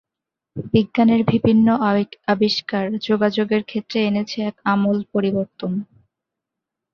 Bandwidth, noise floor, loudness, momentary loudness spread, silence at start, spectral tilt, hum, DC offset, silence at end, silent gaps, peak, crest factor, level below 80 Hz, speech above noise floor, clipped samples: 6.8 kHz; -85 dBFS; -19 LUFS; 10 LU; 0.55 s; -7 dB/octave; none; under 0.1%; 1.1 s; none; -2 dBFS; 18 dB; -54 dBFS; 66 dB; under 0.1%